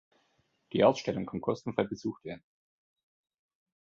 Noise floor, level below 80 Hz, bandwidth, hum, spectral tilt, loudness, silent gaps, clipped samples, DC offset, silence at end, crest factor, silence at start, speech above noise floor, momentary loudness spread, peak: -74 dBFS; -66 dBFS; 7.6 kHz; none; -6.5 dB/octave; -31 LUFS; none; under 0.1%; under 0.1%; 1.5 s; 24 dB; 0.75 s; 43 dB; 18 LU; -10 dBFS